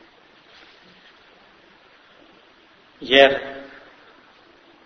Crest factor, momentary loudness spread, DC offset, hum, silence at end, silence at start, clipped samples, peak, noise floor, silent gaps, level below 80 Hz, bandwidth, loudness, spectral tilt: 26 dB; 25 LU; under 0.1%; none; 1.25 s; 3 s; under 0.1%; 0 dBFS; -53 dBFS; none; -62 dBFS; 6.4 kHz; -16 LUFS; -4 dB/octave